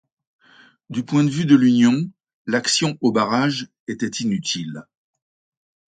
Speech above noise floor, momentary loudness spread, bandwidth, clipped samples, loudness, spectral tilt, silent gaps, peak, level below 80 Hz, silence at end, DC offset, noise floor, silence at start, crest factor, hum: 34 dB; 16 LU; 9.4 kHz; under 0.1%; -19 LUFS; -4.5 dB/octave; 2.34-2.45 s, 3.80-3.87 s; -2 dBFS; -64 dBFS; 1.05 s; under 0.1%; -53 dBFS; 0.9 s; 18 dB; none